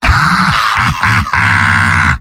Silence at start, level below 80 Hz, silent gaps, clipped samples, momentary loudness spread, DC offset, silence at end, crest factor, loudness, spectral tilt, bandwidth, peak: 0 s; -22 dBFS; none; under 0.1%; 2 LU; under 0.1%; 0 s; 10 dB; -10 LUFS; -4 dB/octave; 16.5 kHz; 0 dBFS